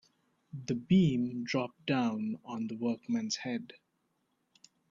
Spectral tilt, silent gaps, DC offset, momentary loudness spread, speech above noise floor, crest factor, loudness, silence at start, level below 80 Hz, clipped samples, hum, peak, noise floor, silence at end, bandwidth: -6 dB/octave; none; under 0.1%; 13 LU; 46 dB; 18 dB; -33 LUFS; 0.55 s; -68 dBFS; under 0.1%; none; -16 dBFS; -78 dBFS; 1.25 s; 7.6 kHz